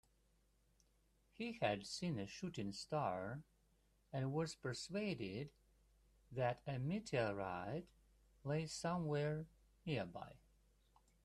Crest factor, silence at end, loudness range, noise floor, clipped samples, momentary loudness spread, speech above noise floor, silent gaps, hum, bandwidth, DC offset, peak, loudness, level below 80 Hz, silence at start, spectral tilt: 20 dB; 0.9 s; 2 LU; -77 dBFS; under 0.1%; 10 LU; 34 dB; none; none; 13 kHz; under 0.1%; -26 dBFS; -44 LUFS; -72 dBFS; 1.4 s; -5.5 dB/octave